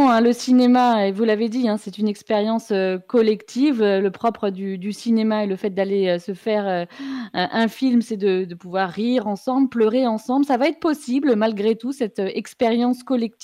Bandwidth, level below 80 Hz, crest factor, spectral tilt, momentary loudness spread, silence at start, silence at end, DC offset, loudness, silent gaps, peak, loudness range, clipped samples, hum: 13 kHz; -68 dBFS; 12 dB; -6 dB/octave; 8 LU; 0 s; 0.15 s; under 0.1%; -20 LUFS; none; -8 dBFS; 3 LU; under 0.1%; none